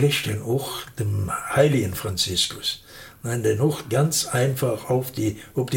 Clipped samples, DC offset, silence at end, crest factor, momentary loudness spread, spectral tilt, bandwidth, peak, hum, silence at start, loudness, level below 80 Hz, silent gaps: under 0.1%; under 0.1%; 0 s; 18 dB; 9 LU; -4.5 dB/octave; 17 kHz; -4 dBFS; none; 0 s; -23 LUFS; -52 dBFS; none